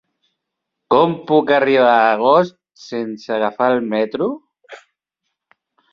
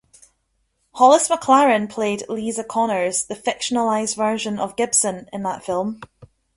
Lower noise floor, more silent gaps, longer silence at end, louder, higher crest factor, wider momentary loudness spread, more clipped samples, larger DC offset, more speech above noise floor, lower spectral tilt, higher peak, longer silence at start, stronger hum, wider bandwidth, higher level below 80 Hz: first, -79 dBFS vs -69 dBFS; neither; first, 1.15 s vs 0.3 s; first, -16 LUFS vs -19 LUFS; about the same, 16 dB vs 18 dB; about the same, 13 LU vs 11 LU; neither; neither; first, 63 dB vs 50 dB; first, -6.5 dB/octave vs -3 dB/octave; about the same, -2 dBFS vs -2 dBFS; about the same, 0.9 s vs 0.95 s; neither; second, 7 kHz vs 11.5 kHz; about the same, -64 dBFS vs -60 dBFS